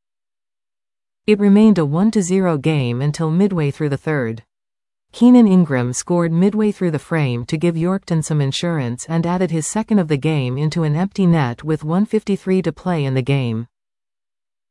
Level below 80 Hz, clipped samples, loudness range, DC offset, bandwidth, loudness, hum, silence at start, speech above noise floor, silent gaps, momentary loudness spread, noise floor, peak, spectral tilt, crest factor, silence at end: -52 dBFS; under 0.1%; 3 LU; under 0.1%; 12 kHz; -17 LUFS; none; 1.3 s; over 74 dB; none; 9 LU; under -90 dBFS; -2 dBFS; -6.5 dB/octave; 16 dB; 1.05 s